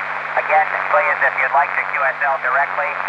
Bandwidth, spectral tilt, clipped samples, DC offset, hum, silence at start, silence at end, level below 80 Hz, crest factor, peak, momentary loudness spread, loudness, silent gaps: 8.8 kHz; -4 dB/octave; under 0.1%; under 0.1%; 50 Hz at -55 dBFS; 0 s; 0 s; -76 dBFS; 14 dB; -4 dBFS; 4 LU; -17 LUFS; none